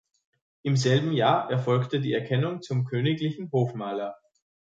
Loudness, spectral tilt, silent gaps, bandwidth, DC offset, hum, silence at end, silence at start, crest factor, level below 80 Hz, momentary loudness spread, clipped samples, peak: -26 LUFS; -6.5 dB/octave; none; 7.8 kHz; under 0.1%; none; 0.6 s; 0.65 s; 18 dB; -68 dBFS; 9 LU; under 0.1%; -10 dBFS